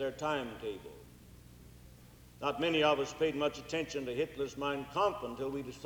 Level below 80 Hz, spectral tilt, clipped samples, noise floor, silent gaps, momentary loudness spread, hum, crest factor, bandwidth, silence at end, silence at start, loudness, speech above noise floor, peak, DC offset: -60 dBFS; -4.5 dB/octave; under 0.1%; -56 dBFS; none; 13 LU; none; 20 dB; over 20 kHz; 0 s; 0 s; -35 LUFS; 21 dB; -16 dBFS; under 0.1%